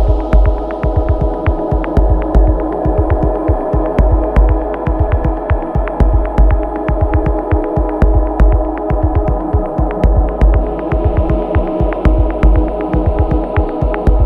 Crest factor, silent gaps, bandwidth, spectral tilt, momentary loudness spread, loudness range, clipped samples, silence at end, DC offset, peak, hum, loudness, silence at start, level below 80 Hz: 12 dB; none; 3.5 kHz; -10.5 dB/octave; 4 LU; 1 LU; under 0.1%; 0 s; under 0.1%; 0 dBFS; none; -15 LUFS; 0 s; -14 dBFS